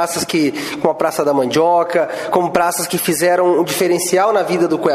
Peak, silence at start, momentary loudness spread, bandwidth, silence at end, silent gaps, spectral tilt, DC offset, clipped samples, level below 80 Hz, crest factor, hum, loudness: 0 dBFS; 0 s; 4 LU; 15.5 kHz; 0 s; none; -4 dB/octave; under 0.1%; under 0.1%; -56 dBFS; 16 dB; none; -15 LUFS